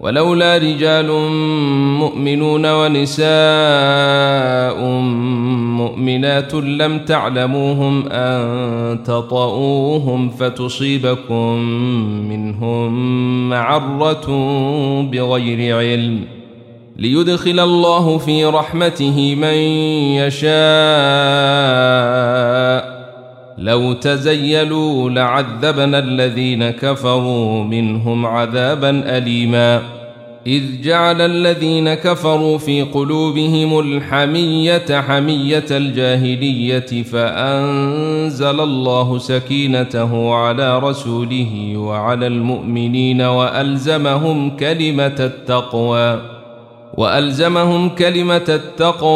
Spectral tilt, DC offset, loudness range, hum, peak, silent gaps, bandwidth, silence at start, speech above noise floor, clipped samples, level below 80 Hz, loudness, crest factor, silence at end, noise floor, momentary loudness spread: -6.5 dB/octave; under 0.1%; 4 LU; none; -2 dBFS; none; 13.5 kHz; 0 s; 24 dB; under 0.1%; -54 dBFS; -15 LUFS; 14 dB; 0 s; -38 dBFS; 6 LU